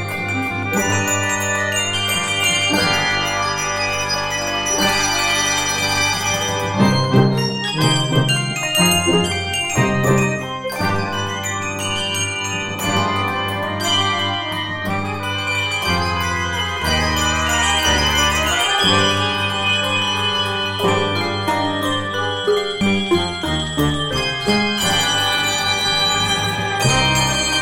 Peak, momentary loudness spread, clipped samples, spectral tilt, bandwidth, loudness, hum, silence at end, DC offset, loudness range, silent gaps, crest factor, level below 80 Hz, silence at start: 0 dBFS; 6 LU; under 0.1%; -3 dB/octave; 17 kHz; -17 LUFS; none; 0 s; under 0.1%; 4 LU; none; 18 dB; -38 dBFS; 0 s